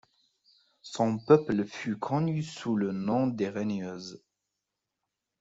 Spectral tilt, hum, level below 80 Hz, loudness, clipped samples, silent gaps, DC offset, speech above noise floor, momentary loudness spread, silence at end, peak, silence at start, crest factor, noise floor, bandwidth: -7 dB/octave; none; -68 dBFS; -29 LUFS; under 0.1%; none; under 0.1%; 57 dB; 15 LU; 1.25 s; -6 dBFS; 0.85 s; 24 dB; -86 dBFS; 8 kHz